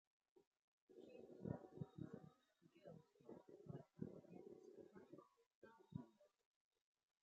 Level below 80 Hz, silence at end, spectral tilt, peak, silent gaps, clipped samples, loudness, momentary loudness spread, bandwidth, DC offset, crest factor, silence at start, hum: -82 dBFS; 0.95 s; -9 dB/octave; -34 dBFS; 0.47-0.51 s, 0.64-0.87 s, 5.46-5.62 s; under 0.1%; -60 LUFS; 12 LU; 7.4 kHz; under 0.1%; 28 dB; 0.35 s; none